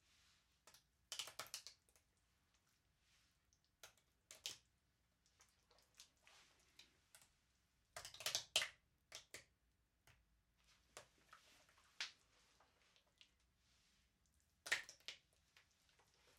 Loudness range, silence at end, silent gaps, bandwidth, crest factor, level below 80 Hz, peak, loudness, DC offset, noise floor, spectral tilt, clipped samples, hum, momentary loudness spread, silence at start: 12 LU; 0.1 s; none; 16 kHz; 36 dB; -86 dBFS; -20 dBFS; -48 LUFS; under 0.1%; -84 dBFS; 1 dB/octave; under 0.1%; none; 25 LU; 0.65 s